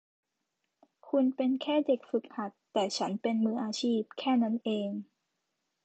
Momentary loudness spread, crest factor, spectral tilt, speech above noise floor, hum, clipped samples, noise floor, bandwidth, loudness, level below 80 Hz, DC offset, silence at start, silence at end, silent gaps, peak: 6 LU; 16 dB; -5 dB/octave; 53 dB; none; under 0.1%; -83 dBFS; 8.8 kHz; -31 LUFS; -84 dBFS; under 0.1%; 1.05 s; 0.8 s; none; -16 dBFS